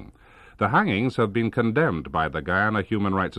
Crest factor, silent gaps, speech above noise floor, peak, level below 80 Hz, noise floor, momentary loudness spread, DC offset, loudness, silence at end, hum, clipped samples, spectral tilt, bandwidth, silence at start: 16 dB; none; 28 dB; -8 dBFS; -48 dBFS; -51 dBFS; 5 LU; under 0.1%; -23 LUFS; 0 s; none; under 0.1%; -8 dB/octave; 10 kHz; 0 s